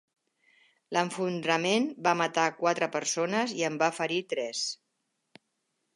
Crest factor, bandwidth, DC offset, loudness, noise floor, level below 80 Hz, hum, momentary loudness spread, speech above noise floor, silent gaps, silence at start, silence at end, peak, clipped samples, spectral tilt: 20 dB; 11.5 kHz; under 0.1%; -29 LUFS; -80 dBFS; -84 dBFS; none; 6 LU; 51 dB; none; 0.9 s; 1.2 s; -10 dBFS; under 0.1%; -3.5 dB/octave